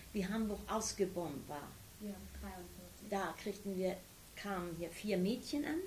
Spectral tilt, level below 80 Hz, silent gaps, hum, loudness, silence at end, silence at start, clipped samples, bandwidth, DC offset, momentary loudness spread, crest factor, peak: -5 dB/octave; -60 dBFS; none; none; -41 LUFS; 0 s; 0 s; under 0.1%; 16 kHz; under 0.1%; 12 LU; 18 dB; -22 dBFS